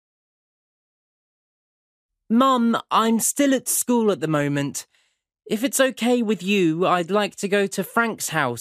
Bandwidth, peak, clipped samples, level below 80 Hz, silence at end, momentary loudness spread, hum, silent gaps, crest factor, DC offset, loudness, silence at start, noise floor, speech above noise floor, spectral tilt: 15.5 kHz; -4 dBFS; under 0.1%; -70 dBFS; 0 s; 5 LU; none; none; 18 dB; under 0.1%; -21 LUFS; 2.3 s; -67 dBFS; 46 dB; -4 dB/octave